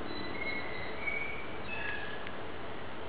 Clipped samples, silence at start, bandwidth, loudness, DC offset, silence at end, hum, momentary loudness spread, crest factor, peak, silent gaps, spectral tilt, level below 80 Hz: under 0.1%; 0 s; 4 kHz; -38 LUFS; 1%; 0 s; none; 8 LU; 16 dB; -22 dBFS; none; -2.5 dB/octave; -56 dBFS